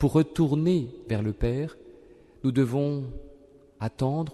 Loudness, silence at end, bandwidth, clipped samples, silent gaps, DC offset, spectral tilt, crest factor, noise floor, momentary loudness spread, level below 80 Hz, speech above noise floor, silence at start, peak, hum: -27 LUFS; 0 s; 12 kHz; under 0.1%; none; under 0.1%; -8.5 dB/octave; 18 dB; -53 dBFS; 12 LU; -42 dBFS; 28 dB; 0 s; -10 dBFS; none